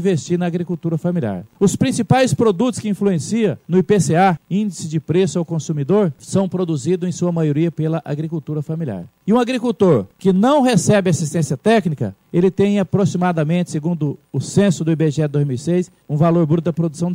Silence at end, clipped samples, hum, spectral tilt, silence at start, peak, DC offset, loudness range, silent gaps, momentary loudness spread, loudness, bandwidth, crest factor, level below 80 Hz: 0 s; under 0.1%; none; -6.5 dB/octave; 0 s; -2 dBFS; under 0.1%; 3 LU; none; 8 LU; -18 LUFS; 15 kHz; 14 dB; -54 dBFS